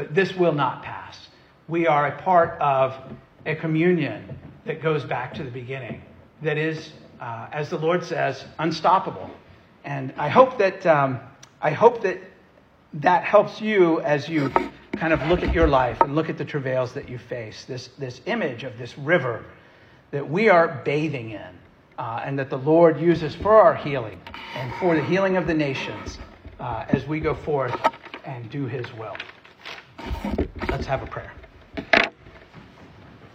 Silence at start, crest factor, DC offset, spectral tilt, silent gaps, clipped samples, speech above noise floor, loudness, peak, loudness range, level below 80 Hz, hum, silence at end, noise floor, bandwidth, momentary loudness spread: 0 s; 22 dB; under 0.1%; -7 dB/octave; none; under 0.1%; 32 dB; -22 LUFS; -2 dBFS; 8 LU; -42 dBFS; none; 0.1 s; -54 dBFS; 8.4 kHz; 19 LU